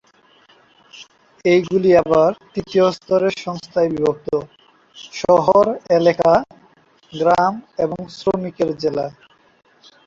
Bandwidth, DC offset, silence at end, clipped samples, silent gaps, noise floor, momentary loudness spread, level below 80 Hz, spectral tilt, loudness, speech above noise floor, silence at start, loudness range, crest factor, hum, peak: 7.6 kHz; under 0.1%; 0.95 s; under 0.1%; none; -53 dBFS; 11 LU; -54 dBFS; -6.5 dB/octave; -18 LUFS; 36 dB; 0.95 s; 4 LU; 16 dB; none; -2 dBFS